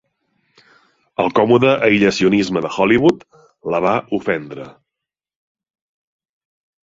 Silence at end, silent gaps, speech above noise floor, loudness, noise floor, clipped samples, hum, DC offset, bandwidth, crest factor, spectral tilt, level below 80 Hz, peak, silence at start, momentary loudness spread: 2.1 s; none; 68 dB; -16 LUFS; -84 dBFS; under 0.1%; none; under 0.1%; 7.8 kHz; 18 dB; -6 dB/octave; -52 dBFS; 0 dBFS; 1.2 s; 16 LU